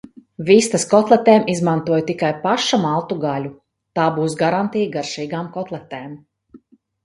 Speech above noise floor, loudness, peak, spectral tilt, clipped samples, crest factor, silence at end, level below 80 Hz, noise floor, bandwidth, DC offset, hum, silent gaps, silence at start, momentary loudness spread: 31 dB; -18 LUFS; 0 dBFS; -5 dB/octave; under 0.1%; 18 dB; 0.5 s; -62 dBFS; -49 dBFS; 11.5 kHz; under 0.1%; none; none; 0.4 s; 15 LU